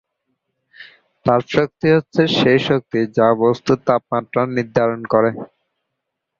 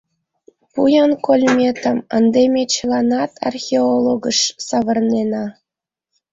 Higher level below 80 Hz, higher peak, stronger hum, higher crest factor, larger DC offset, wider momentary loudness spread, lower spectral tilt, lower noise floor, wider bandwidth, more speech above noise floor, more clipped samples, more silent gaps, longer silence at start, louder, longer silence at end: about the same, -54 dBFS vs -58 dBFS; about the same, -2 dBFS vs -2 dBFS; neither; about the same, 16 dB vs 14 dB; neither; second, 6 LU vs 9 LU; first, -7 dB/octave vs -3.5 dB/octave; second, -78 dBFS vs -86 dBFS; about the same, 7.4 kHz vs 7.8 kHz; second, 61 dB vs 70 dB; neither; neither; about the same, 0.8 s vs 0.75 s; about the same, -17 LUFS vs -16 LUFS; first, 0.95 s vs 0.8 s